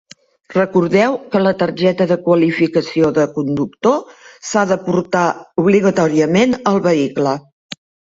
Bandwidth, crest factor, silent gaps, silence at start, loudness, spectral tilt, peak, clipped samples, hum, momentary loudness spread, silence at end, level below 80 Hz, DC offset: 7.8 kHz; 14 dB; 7.53-7.69 s; 0.5 s; -15 LUFS; -6 dB/octave; 0 dBFS; under 0.1%; none; 7 LU; 0.35 s; -54 dBFS; under 0.1%